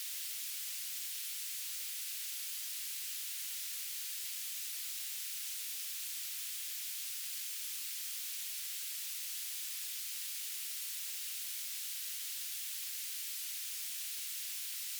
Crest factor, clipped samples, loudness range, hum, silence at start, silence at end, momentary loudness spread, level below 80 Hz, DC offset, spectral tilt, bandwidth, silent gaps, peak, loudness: 14 dB; under 0.1%; 0 LU; none; 0 s; 0 s; 0 LU; under -90 dBFS; under 0.1%; 10 dB/octave; over 20 kHz; none; -28 dBFS; -38 LUFS